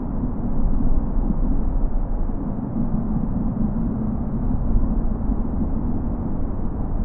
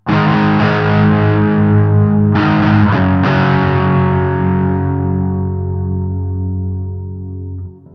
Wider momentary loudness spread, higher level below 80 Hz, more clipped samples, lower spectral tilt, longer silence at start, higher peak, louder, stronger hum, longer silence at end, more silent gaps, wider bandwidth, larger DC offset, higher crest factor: second, 4 LU vs 12 LU; first, -22 dBFS vs -38 dBFS; neither; first, -13.5 dB/octave vs -9.5 dB/octave; about the same, 0 s vs 0.05 s; second, -8 dBFS vs 0 dBFS; second, -25 LUFS vs -13 LUFS; neither; second, 0 s vs 0.25 s; neither; second, 2 kHz vs 6 kHz; neither; about the same, 12 dB vs 12 dB